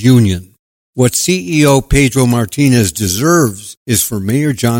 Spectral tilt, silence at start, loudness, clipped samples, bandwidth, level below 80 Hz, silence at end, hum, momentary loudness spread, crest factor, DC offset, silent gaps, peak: -5 dB/octave; 0 s; -12 LUFS; under 0.1%; 17 kHz; -30 dBFS; 0 s; none; 5 LU; 12 dB; under 0.1%; 0.59-0.93 s, 3.77-3.86 s; 0 dBFS